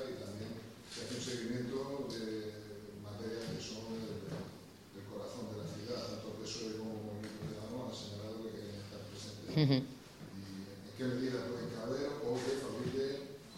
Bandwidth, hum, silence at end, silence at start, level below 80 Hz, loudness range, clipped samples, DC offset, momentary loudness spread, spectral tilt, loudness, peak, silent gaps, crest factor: 16 kHz; none; 0 s; 0 s; -68 dBFS; 6 LU; under 0.1%; under 0.1%; 11 LU; -5.5 dB/octave; -41 LUFS; -18 dBFS; none; 24 dB